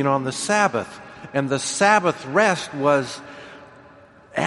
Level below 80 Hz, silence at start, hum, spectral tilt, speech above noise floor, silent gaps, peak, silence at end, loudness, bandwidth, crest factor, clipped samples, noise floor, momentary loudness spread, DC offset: -64 dBFS; 0 s; none; -4 dB/octave; 28 dB; none; -2 dBFS; 0 s; -20 LUFS; 11.5 kHz; 20 dB; under 0.1%; -48 dBFS; 21 LU; under 0.1%